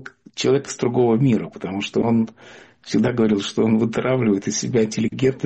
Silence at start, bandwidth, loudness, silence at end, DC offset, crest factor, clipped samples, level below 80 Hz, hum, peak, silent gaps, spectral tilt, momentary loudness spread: 0 s; 8.4 kHz; -20 LUFS; 0 s; under 0.1%; 12 dB; under 0.1%; -56 dBFS; none; -8 dBFS; none; -6 dB/octave; 6 LU